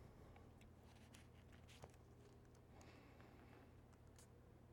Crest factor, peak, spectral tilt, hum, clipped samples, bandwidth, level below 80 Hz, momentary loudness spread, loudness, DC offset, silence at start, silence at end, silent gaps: 24 dB; -42 dBFS; -5.5 dB/octave; none; under 0.1%; 17.5 kHz; -74 dBFS; 3 LU; -66 LUFS; under 0.1%; 0 s; 0 s; none